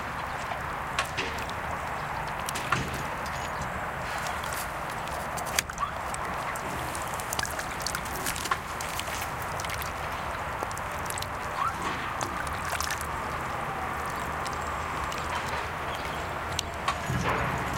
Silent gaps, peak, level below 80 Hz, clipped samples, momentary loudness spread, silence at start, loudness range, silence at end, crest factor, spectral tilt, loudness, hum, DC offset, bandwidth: none; -4 dBFS; -46 dBFS; under 0.1%; 4 LU; 0 s; 1 LU; 0 s; 28 dB; -3 dB/octave; -31 LUFS; none; under 0.1%; 17 kHz